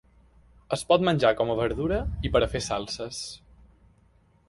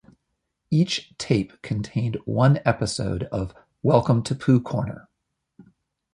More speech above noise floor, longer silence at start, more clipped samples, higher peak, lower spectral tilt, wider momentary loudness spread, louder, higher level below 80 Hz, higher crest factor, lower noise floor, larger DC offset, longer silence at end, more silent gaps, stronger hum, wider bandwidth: second, 36 dB vs 56 dB; about the same, 0.7 s vs 0.7 s; neither; second, -6 dBFS vs -2 dBFS; second, -5 dB/octave vs -6.5 dB/octave; about the same, 12 LU vs 11 LU; second, -26 LUFS vs -23 LUFS; first, -42 dBFS vs -48 dBFS; about the same, 22 dB vs 22 dB; second, -61 dBFS vs -78 dBFS; neither; first, 1.15 s vs 0.5 s; neither; neither; about the same, 11.5 kHz vs 11.5 kHz